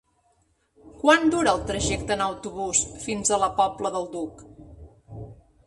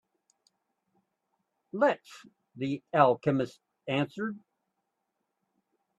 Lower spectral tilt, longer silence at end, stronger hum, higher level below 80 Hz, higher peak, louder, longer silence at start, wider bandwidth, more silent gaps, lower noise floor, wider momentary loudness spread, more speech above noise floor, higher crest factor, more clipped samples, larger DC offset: second, -3 dB/octave vs -7 dB/octave; second, 0.35 s vs 1.6 s; neither; first, -46 dBFS vs -76 dBFS; about the same, -6 dBFS vs -8 dBFS; first, -24 LUFS vs -29 LUFS; second, 0.85 s vs 1.75 s; about the same, 11.5 kHz vs 12 kHz; neither; second, -67 dBFS vs -82 dBFS; first, 23 LU vs 16 LU; second, 43 dB vs 54 dB; second, 20 dB vs 26 dB; neither; neither